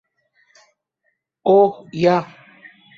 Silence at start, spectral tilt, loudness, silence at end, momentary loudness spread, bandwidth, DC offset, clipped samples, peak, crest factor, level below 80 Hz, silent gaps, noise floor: 1.45 s; -7.5 dB/octave; -17 LUFS; 0.75 s; 10 LU; 7.2 kHz; under 0.1%; under 0.1%; -2 dBFS; 18 dB; -64 dBFS; none; -71 dBFS